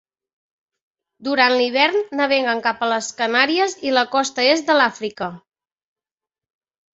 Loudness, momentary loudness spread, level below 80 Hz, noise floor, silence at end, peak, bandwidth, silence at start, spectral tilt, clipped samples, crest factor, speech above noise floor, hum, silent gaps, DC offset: -18 LUFS; 10 LU; -68 dBFS; under -90 dBFS; 1.55 s; -2 dBFS; 8 kHz; 1.2 s; -2 dB/octave; under 0.1%; 20 dB; over 71 dB; none; none; under 0.1%